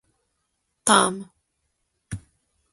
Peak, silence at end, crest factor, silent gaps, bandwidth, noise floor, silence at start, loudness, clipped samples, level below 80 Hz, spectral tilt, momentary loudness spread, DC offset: -2 dBFS; 0.55 s; 26 dB; none; 12 kHz; -76 dBFS; 0.85 s; -20 LUFS; under 0.1%; -56 dBFS; -2.5 dB/octave; 21 LU; under 0.1%